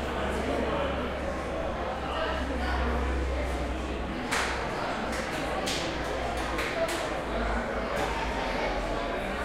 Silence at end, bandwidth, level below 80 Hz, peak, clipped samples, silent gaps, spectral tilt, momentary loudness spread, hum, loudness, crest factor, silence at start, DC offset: 0 s; 15.5 kHz; -36 dBFS; -14 dBFS; under 0.1%; none; -4.5 dB/octave; 3 LU; none; -31 LUFS; 16 dB; 0 s; under 0.1%